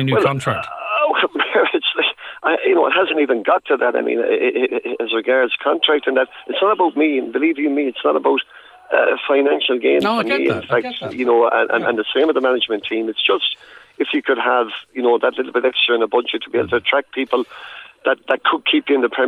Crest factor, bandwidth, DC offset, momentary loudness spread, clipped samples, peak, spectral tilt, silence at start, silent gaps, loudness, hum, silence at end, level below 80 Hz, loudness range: 16 dB; 11 kHz; under 0.1%; 6 LU; under 0.1%; -2 dBFS; -6 dB/octave; 0 s; none; -17 LUFS; none; 0 s; -64 dBFS; 2 LU